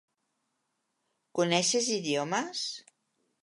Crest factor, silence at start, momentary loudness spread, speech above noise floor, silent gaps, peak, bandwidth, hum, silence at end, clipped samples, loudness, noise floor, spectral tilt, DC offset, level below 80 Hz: 22 dB; 1.35 s; 12 LU; 51 dB; none; -10 dBFS; 11.5 kHz; none; 0.65 s; under 0.1%; -29 LUFS; -80 dBFS; -3 dB/octave; under 0.1%; -84 dBFS